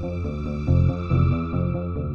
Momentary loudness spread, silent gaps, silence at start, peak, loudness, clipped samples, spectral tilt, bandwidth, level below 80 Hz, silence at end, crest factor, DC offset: 8 LU; none; 0 s; -8 dBFS; -23 LUFS; under 0.1%; -10 dB/octave; 5.6 kHz; -32 dBFS; 0 s; 14 dB; 0.1%